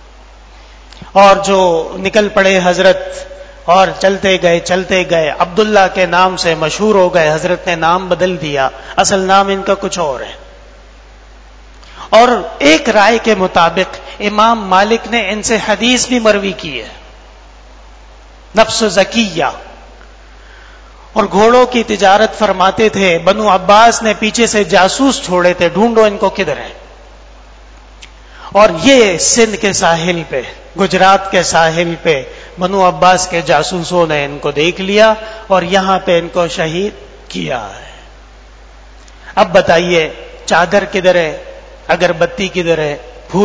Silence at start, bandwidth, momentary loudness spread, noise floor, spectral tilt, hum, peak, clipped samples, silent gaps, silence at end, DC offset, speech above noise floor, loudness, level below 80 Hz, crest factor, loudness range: 0.95 s; 8 kHz; 11 LU; -37 dBFS; -3.5 dB/octave; none; 0 dBFS; 0.7%; none; 0 s; under 0.1%; 26 dB; -11 LUFS; -38 dBFS; 12 dB; 6 LU